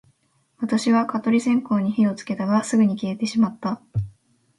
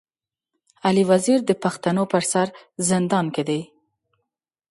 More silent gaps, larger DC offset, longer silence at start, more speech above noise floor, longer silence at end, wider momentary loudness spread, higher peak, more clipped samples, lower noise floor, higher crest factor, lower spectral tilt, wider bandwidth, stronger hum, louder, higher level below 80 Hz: neither; neither; second, 0.6 s vs 0.85 s; second, 44 dB vs 65 dB; second, 0.5 s vs 1.05 s; about the same, 10 LU vs 8 LU; about the same, -6 dBFS vs -4 dBFS; neither; second, -65 dBFS vs -86 dBFS; about the same, 16 dB vs 18 dB; about the same, -6 dB/octave vs -5 dB/octave; about the same, 11.5 kHz vs 11.5 kHz; neither; about the same, -22 LUFS vs -21 LUFS; first, -54 dBFS vs -64 dBFS